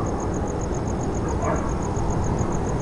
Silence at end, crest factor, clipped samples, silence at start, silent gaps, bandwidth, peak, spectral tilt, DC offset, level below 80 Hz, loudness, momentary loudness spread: 0 s; 12 dB; under 0.1%; 0 s; none; 11.5 kHz; -10 dBFS; -7 dB/octave; under 0.1%; -30 dBFS; -25 LUFS; 2 LU